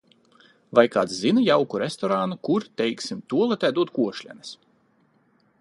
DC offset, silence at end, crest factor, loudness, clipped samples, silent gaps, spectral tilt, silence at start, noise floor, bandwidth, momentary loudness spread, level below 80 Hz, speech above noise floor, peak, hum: under 0.1%; 1.05 s; 22 dB; -23 LUFS; under 0.1%; none; -5.5 dB/octave; 0.7 s; -63 dBFS; 11.5 kHz; 13 LU; -70 dBFS; 41 dB; -2 dBFS; none